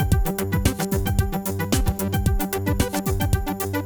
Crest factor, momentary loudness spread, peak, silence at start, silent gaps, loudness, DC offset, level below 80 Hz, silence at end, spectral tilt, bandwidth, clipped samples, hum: 16 dB; 2 LU; -6 dBFS; 0 s; none; -23 LUFS; under 0.1%; -28 dBFS; 0 s; -5.5 dB/octave; over 20 kHz; under 0.1%; none